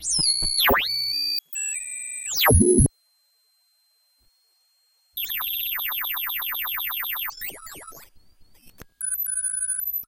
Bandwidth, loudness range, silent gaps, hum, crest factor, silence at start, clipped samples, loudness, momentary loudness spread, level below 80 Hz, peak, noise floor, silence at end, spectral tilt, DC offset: 17 kHz; 8 LU; none; none; 22 dB; 0 s; under 0.1%; -22 LUFS; 13 LU; -38 dBFS; -4 dBFS; -66 dBFS; 0 s; -3 dB/octave; under 0.1%